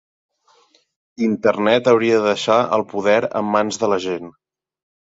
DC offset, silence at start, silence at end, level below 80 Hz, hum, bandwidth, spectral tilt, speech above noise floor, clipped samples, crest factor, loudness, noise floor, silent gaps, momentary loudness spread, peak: under 0.1%; 1.2 s; 0.8 s; -60 dBFS; none; 7.8 kHz; -5 dB/octave; 40 dB; under 0.1%; 18 dB; -18 LUFS; -57 dBFS; none; 7 LU; -2 dBFS